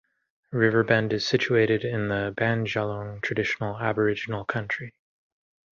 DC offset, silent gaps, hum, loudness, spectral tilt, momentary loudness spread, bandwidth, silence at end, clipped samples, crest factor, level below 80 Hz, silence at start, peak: under 0.1%; none; none; -25 LUFS; -6 dB/octave; 9 LU; 7.4 kHz; 0.9 s; under 0.1%; 20 dB; -58 dBFS; 0.5 s; -6 dBFS